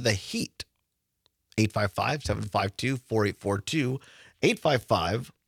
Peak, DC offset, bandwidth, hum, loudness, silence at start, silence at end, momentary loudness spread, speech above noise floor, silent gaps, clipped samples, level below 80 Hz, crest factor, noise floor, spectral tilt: -8 dBFS; under 0.1%; 16 kHz; none; -28 LUFS; 0 s; 0.15 s; 9 LU; 52 dB; none; under 0.1%; -56 dBFS; 20 dB; -79 dBFS; -5 dB/octave